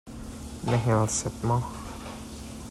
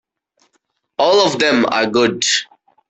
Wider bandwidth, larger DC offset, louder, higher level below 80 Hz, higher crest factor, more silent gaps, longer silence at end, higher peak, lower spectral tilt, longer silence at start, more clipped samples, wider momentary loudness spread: first, 13 kHz vs 8.4 kHz; neither; second, -28 LUFS vs -15 LUFS; first, -46 dBFS vs -58 dBFS; about the same, 16 dB vs 16 dB; neither; second, 0 s vs 0.45 s; second, -14 dBFS vs -2 dBFS; first, -5.5 dB/octave vs -2.5 dB/octave; second, 0.05 s vs 1 s; neither; first, 16 LU vs 6 LU